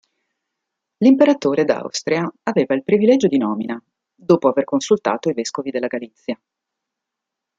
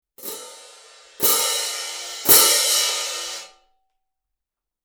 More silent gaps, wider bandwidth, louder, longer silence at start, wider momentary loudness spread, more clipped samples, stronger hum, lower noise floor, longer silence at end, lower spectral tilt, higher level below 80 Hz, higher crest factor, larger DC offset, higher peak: neither; second, 7.8 kHz vs over 20 kHz; about the same, -18 LUFS vs -17 LUFS; first, 1 s vs 0.2 s; second, 15 LU vs 21 LU; neither; neither; about the same, -83 dBFS vs -85 dBFS; about the same, 1.25 s vs 1.35 s; first, -5.5 dB/octave vs 1 dB/octave; second, -66 dBFS vs -58 dBFS; about the same, 18 dB vs 22 dB; neither; about the same, -2 dBFS vs 0 dBFS